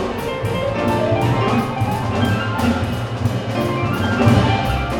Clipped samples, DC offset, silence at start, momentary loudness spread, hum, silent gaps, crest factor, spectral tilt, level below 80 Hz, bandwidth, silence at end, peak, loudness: under 0.1%; under 0.1%; 0 s; 7 LU; none; none; 18 dB; -6.5 dB/octave; -34 dBFS; 18 kHz; 0 s; 0 dBFS; -19 LUFS